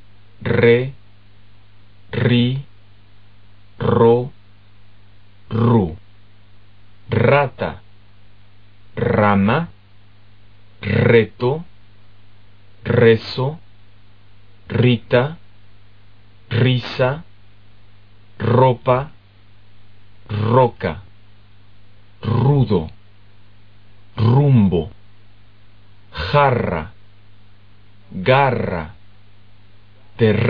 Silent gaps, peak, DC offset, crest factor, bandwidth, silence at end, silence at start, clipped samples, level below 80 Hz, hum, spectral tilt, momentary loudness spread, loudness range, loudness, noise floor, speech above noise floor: none; 0 dBFS; 1%; 20 dB; 5.2 kHz; 0 s; 0.4 s; under 0.1%; -46 dBFS; 50 Hz at -45 dBFS; -6 dB/octave; 18 LU; 4 LU; -17 LUFS; -50 dBFS; 34 dB